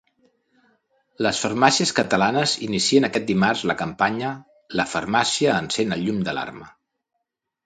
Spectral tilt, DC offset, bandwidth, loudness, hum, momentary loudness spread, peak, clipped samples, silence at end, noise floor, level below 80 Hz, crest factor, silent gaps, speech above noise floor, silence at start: -3.5 dB/octave; under 0.1%; 9.6 kHz; -21 LUFS; none; 10 LU; 0 dBFS; under 0.1%; 1 s; -79 dBFS; -58 dBFS; 22 dB; none; 58 dB; 1.2 s